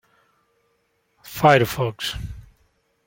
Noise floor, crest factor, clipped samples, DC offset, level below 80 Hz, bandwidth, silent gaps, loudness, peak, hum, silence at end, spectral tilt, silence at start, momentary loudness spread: -68 dBFS; 22 dB; under 0.1%; under 0.1%; -46 dBFS; 17 kHz; none; -20 LUFS; -2 dBFS; none; 0.65 s; -5 dB/octave; 1.25 s; 21 LU